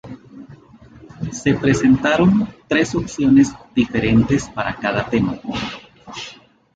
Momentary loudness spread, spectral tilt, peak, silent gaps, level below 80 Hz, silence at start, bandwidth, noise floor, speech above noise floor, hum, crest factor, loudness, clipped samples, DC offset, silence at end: 18 LU; -6 dB/octave; -2 dBFS; none; -42 dBFS; 0.05 s; 9 kHz; -44 dBFS; 27 dB; none; 16 dB; -18 LUFS; under 0.1%; under 0.1%; 0.4 s